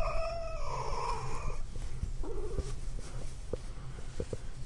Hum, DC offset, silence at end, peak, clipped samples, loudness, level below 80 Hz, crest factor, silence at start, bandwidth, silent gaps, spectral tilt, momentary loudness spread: none; under 0.1%; 0 s; -20 dBFS; under 0.1%; -41 LUFS; -38 dBFS; 14 dB; 0 s; 11 kHz; none; -5.5 dB/octave; 9 LU